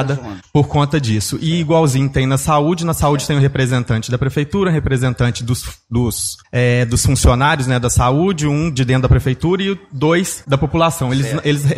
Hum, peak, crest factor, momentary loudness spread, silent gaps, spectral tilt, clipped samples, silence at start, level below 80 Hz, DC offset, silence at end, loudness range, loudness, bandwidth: none; 0 dBFS; 14 dB; 5 LU; none; -5.5 dB/octave; under 0.1%; 0 s; -28 dBFS; under 0.1%; 0 s; 2 LU; -16 LUFS; 15 kHz